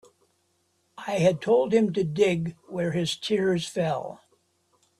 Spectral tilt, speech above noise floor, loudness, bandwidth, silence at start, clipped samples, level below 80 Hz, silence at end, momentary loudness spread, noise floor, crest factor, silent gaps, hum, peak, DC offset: -6 dB/octave; 46 dB; -25 LUFS; 13 kHz; 1 s; under 0.1%; -64 dBFS; 0.85 s; 11 LU; -70 dBFS; 18 dB; none; none; -8 dBFS; under 0.1%